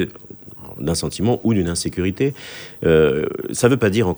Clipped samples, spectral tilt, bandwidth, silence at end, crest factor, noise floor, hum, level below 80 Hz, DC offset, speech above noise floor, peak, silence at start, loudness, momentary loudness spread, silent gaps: under 0.1%; -5.5 dB/octave; over 20 kHz; 0 s; 18 dB; -39 dBFS; none; -42 dBFS; under 0.1%; 21 dB; 0 dBFS; 0 s; -19 LUFS; 19 LU; none